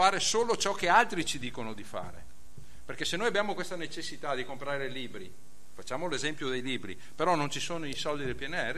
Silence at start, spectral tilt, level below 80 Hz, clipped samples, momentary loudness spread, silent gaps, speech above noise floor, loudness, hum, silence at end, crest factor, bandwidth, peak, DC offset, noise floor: 0 s; -3 dB/octave; -58 dBFS; under 0.1%; 17 LU; none; 21 dB; -31 LUFS; none; 0 s; 24 dB; 15 kHz; -8 dBFS; 2%; -53 dBFS